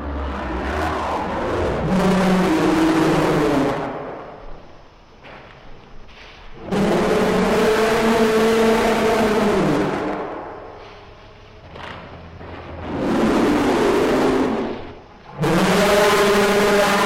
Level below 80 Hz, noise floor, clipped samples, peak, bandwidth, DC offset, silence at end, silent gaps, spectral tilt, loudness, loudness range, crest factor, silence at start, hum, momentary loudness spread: -38 dBFS; -44 dBFS; under 0.1%; -6 dBFS; 16 kHz; under 0.1%; 0 s; none; -5.5 dB/octave; -18 LUFS; 10 LU; 14 dB; 0 s; none; 19 LU